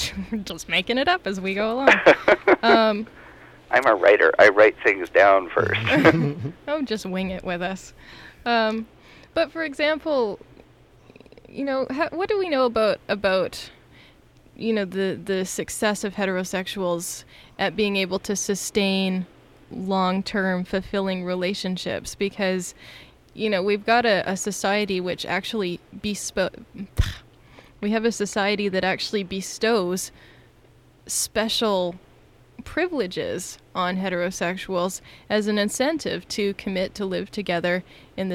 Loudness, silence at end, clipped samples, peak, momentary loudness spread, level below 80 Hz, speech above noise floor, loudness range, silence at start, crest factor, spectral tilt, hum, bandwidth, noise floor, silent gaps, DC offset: -23 LUFS; 0 s; under 0.1%; -4 dBFS; 14 LU; -46 dBFS; 31 dB; 9 LU; 0 s; 20 dB; -4 dB/octave; none; 16 kHz; -54 dBFS; none; under 0.1%